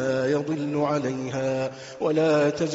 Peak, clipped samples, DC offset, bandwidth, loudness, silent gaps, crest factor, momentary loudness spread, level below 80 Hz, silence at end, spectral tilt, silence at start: -10 dBFS; under 0.1%; under 0.1%; 8 kHz; -25 LUFS; none; 14 dB; 8 LU; -62 dBFS; 0 s; -5.5 dB/octave; 0 s